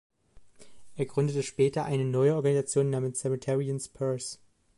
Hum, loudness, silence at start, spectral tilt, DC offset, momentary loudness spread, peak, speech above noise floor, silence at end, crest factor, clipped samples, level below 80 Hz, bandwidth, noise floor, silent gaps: none; -29 LUFS; 0.35 s; -6 dB/octave; under 0.1%; 10 LU; -14 dBFS; 26 dB; 0.45 s; 16 dB; under 0.1%; -66 dBFS; 11.5 kHz; -54 dBFS; none